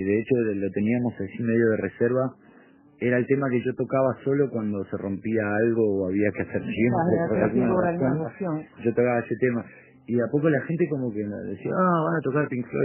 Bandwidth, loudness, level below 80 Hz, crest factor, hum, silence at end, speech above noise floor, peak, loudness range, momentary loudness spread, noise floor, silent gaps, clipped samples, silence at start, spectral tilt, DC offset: 3.2 kHz; -25 LUFS; -56 dBFS; 18 dB; none; 0 s; 30 dB; -8 dBFS; 2 LU; 8 LU; -54 dBFS; none; under 0.1%; 0 s; -12 dB/octave; under 0.1%